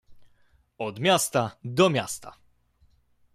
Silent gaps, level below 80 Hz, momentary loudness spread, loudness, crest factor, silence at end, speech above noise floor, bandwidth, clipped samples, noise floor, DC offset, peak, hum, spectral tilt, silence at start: none; -64 dBFS; 13 LU; -25 LUFS; 20 dB; 1.05 s; 38 dB; 16 kHz; under 0.1%; -63 dBFS; under 0.1%; -8 dBFS; none; -4 dB/octave; 0.1 s